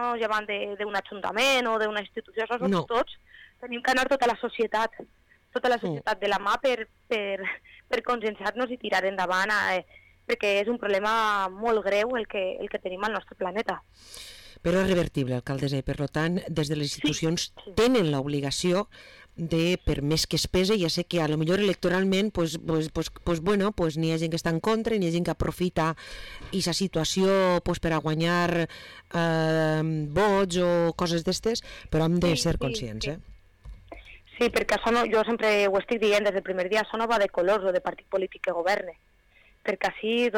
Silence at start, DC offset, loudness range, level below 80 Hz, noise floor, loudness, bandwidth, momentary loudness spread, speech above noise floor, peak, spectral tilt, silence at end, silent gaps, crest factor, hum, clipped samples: 0 s; under 0.1%; 3 LU; -46 dBFS; -59 dBFS; -26 LUFS; 18 kHz; 9 LU; 33 dB; -16 dBFS; -5 dB/octave; 0 s; none; 10 dB; none; under 0.1%